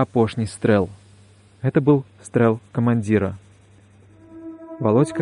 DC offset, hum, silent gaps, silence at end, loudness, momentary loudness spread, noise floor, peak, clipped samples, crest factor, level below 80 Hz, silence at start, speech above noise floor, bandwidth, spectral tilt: under 0.1%; none; none; 0 s; -21 LUFS; 19 LU; -51 dBFS; -4 dBFS; under 0.1%; 16 dB; -56 dBFS; 0 s; 31 dB; 10.5 kHz; -8 dB/octave